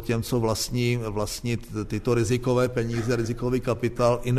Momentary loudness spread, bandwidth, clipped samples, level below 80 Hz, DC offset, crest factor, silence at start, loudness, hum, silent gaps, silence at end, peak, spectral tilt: 6 LU; 13.5 kHz; under 0.1%; -42 dBFS; under 0.1%; 16 dB; 0 s; -26 LUFS; none; none; 0 s; -8 dBFS; -6 dB/octave